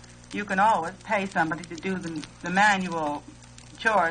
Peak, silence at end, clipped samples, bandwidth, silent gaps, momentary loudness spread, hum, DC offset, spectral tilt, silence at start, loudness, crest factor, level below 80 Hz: -8 dBFS; 0 s; under 0.1%; 9.4 kHz; none; 13 LU; 60 Hz at -50 dBFS; under 0.1%; -4.5 dB/octave; 0 s; -26 LUFS; 18 dB; -56 dBFS